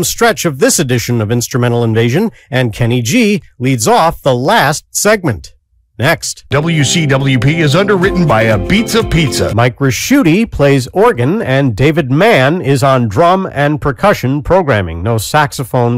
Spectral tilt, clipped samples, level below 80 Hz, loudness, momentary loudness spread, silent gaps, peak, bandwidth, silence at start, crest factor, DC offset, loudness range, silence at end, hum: -5 dB/octave; under 0.1%; -32 dBFS; -11 LUFS; 4 LU; none; -2 dBFS; 16.5 kHz; 0 s; 10 dB; under 0.1%; 2 LU; 0 s; none